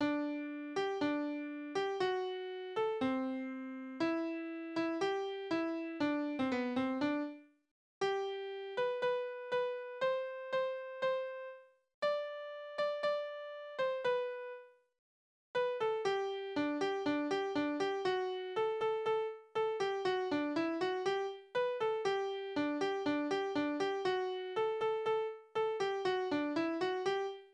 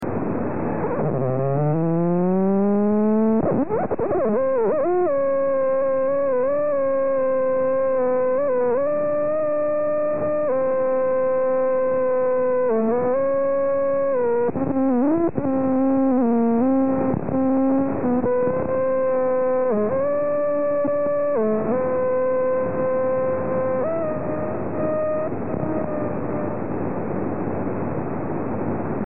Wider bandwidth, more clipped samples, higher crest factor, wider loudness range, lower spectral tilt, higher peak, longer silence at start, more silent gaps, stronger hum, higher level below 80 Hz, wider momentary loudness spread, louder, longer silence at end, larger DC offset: first, 9.8 kHz vs 2.8 kHz; neither; about the same, 14 dB vs 12 dB; about the same, 3 LU vs 4 LU; about the same, -5 dB/octave vs -5.5 dB/octave; second, -22 dBFS vs -8 dBFS; about the same, 0 s vs 0 s; first, 7.71-8.01 s, 11.94-12.02 s, 14.99-15.54 s vs none; neither; second, -78 dBFS vs -54 dBFS; about the same, 6 LU vs 7 LU; second, -37 LUFS vs -21 LUFS; about the same, 0.05 s vs 0 s; second, under 0.1% vs 2%